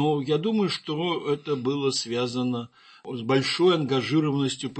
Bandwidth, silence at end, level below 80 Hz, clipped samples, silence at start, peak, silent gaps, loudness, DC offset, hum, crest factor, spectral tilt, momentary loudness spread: 8.8 kHz; 0 s; -70 dBFS; under 0.1%; 0 s; -8 dBFS; none; -25 LUFS; under 0.1%; none; 16 dB; -5.5 dB/octave; 11 LU